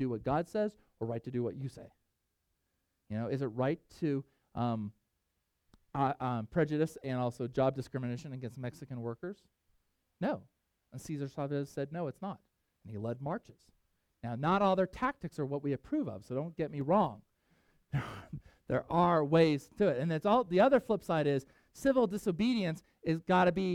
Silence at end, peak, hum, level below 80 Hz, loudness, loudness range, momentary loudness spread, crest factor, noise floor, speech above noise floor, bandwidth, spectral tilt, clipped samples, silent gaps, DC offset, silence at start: 0 s; -14 dBFS; none; -64 dBFS; -34 LUFS; 11 LU; 15 LU; 20 dB; -82 dBFS; 49 dB; 15 kHz; -7.5 dB/octave; under 0.1%; none; under 0.1%; 0 s